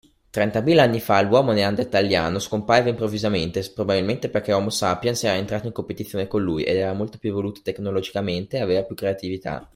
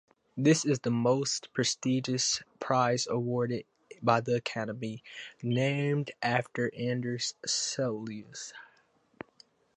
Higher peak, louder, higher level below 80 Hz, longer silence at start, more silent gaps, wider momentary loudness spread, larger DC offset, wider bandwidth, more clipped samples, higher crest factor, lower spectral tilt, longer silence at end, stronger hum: first, -2 dBFS vs -10 dBFS; first, -22 LUFS vs -30 LUFS; first, -52 dBFS vs -72 dBFS; about the same, 0.35 s vs 0.35 s; neither; second, 10 LU vs 15 LU; neither; first, 16 kHz vs 11 kHz; neither; about the same, 20 dB vs 22 dB; about the same, -5.5 dB/octave vs -4.5 dB/octave; second, 0.1 s vs 1.15 s; neither